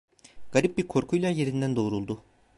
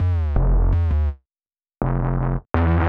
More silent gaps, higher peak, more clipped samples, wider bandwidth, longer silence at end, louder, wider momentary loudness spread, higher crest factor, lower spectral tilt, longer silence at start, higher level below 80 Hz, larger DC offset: neither; second, -8 dBFS vs -2 dBFS; neither; first, 11.5 kHz vs 4 kHz; first, 0.35 s vs 0 s; second, -27 LUFS vs -22 LUFS; about the same, 8 LU vs 7 LU; about the same, 20 dB vs 16 dB; second, -6.5 dB/octave vs -10.5 dB/octave; first, 0.25 s vs 0 s; second, -58 dBFS vs -22 dBFS; neither